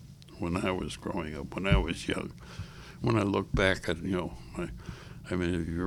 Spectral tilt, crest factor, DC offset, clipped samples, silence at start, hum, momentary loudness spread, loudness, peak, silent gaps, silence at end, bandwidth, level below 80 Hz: -6 dB/octave; 20 dB; under 0.1%; under 0.1%; 0 s; none; 17 LU; -32 LUFS; -10 dBFS; none; 0 s; 14.5 kHz; -42 dBFS